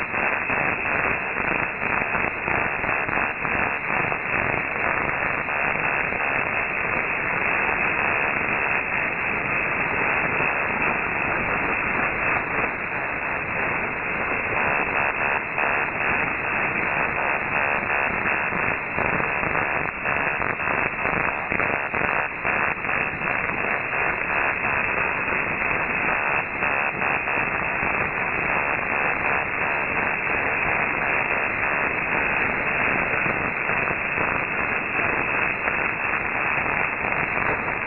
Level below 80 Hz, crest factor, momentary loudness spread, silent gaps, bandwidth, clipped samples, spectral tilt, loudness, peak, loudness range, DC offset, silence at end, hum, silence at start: -46 dBFS; 20 dB; 2 LU; none; 4 kHz; under 0.1%; -3.5 dB/octave; -22 LUFS; -4 dBFS; 1 LU; 0.1%; 0 s; none; 0 s